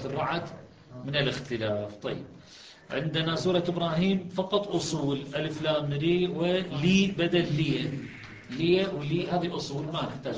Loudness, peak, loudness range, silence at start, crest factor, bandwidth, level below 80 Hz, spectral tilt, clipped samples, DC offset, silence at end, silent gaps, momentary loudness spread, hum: -28 LUFS; -12 dBFS; 4 LU; 0 s; 16 dB; 9.4 kHz; -56 dBFS; -6 dB/octave; under 0.1%; under 0.1%; 0 s; none; 14 LU; none